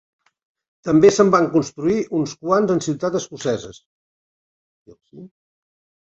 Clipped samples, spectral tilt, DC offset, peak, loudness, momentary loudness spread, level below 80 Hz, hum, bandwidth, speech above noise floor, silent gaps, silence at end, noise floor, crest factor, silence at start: under 0.1%; -6 dB/octave; under 0.1%; -2 dBFS; -18 LUFS; 11 LU; -58 dBFS; none; 8 kHz; over 72 dB; 3.86-4.86 s; 0.85 s; under -90 dBFS; 20 dB; 0.85 s